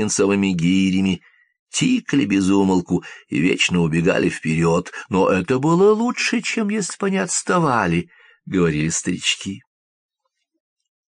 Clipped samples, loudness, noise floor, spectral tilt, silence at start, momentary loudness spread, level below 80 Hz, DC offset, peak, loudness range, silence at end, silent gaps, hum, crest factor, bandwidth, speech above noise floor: under 0.1%; -19 LUFS; -74 dBFS; -5 dB/octave; 0 s; 8 LU; -52 dBFS; under 0.1%; -4 dBFS; 3 LU; 1.55 s; 1.59-1.67 s; none; 16 dB; 10 kHz; 56 dB